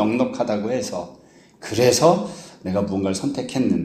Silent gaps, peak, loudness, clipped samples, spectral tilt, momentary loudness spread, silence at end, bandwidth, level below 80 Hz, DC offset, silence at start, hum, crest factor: none; -2 dBFS; -21 LUFS; under 0.1%; -5 dB/octave; 16 LU; 0 s; 15.5 kHz; -56 dBFS; under 0.1%; 0 s; none; 20 dB